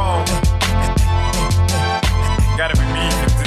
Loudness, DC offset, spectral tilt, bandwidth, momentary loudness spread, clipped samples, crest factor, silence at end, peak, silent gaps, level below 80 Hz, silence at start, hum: -17 LUFS; under 0.1%; -4.5 dB/octave; 14.5 kHz; 1 LU; under 0.1%; 10 dB; 0 s; -6 dBFS; none; -20 dBFS; 0 s; none